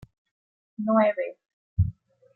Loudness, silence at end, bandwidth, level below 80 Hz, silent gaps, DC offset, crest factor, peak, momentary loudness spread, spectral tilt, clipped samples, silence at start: -26 LUFS; 0.45 s; 4.2 kHz; -46 dBFS; 1.53-1.77 s; under 0.1%; 18 dB; -10 dBFS; 13 LU; -11 dB/octave; under 0.1%; 0.8 s